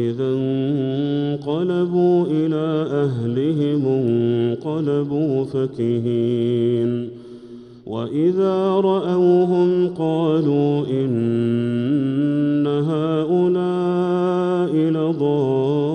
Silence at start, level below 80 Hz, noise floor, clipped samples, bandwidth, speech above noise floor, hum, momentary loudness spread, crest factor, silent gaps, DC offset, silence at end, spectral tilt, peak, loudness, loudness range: 0 s; -62 dBFS; -39 dBFS; under 0.1%; 8.6 kHz; 21 dB; none; 5 LU; 12 dB; none; under 0.1%; 0 s; -9.5 dB/octave; -6 dBFS; -19 LUFS; 3 LU